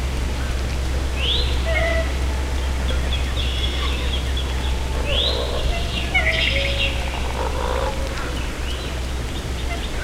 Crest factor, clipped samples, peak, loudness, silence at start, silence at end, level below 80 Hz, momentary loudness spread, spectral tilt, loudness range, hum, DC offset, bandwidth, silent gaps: 16 dB; under 0.1%; -6 dBFS; -22 LUFS; 0 s; 0 s; -24 dBFS; 8 LU; -4.5 dB/octave; 2 LU; none; under 0.1%; 15 kHz; none